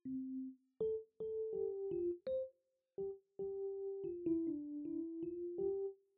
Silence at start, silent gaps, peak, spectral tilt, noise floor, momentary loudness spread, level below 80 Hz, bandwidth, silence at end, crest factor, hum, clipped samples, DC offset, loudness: 0.05 s; none; -30 dBFS; -9.5 dB/octave; -73 dBFS; 8 LU; -76 dBFS; 3.2 kHz; 0.2 s; 14 dB; none; under 0.1%; under 0.1%; -43 LUFS